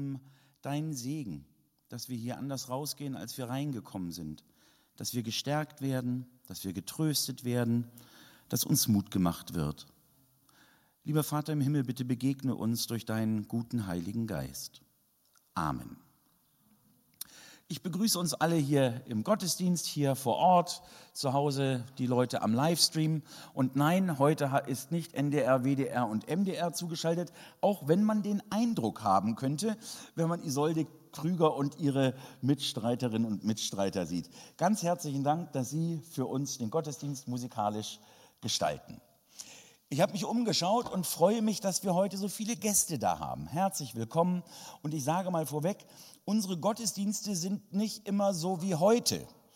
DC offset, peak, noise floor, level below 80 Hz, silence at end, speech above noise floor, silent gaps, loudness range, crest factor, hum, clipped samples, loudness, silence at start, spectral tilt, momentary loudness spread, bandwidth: under 0.1%; -8 dBFS; -71 dBFS; -68 dBFS; 0.25 s; 39 dB; none; 8 LU; 24 dB; none; under 0.1%; -32 LUFS; 0 s; -5 dB/octave; 13 LU; 16.5 kHz